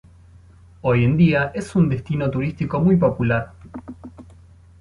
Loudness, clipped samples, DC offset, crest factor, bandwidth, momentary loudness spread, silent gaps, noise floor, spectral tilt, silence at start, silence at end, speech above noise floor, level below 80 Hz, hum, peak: -20 LUFS; under 0.1%; under 0.1%; 16 dB; 11 kHz; 21 LU; none; -47 dBFS; -8.5 dB/octave; 0.85 s; 0.6 s; 28 dB; -44 dBFS; none; -4 dBFS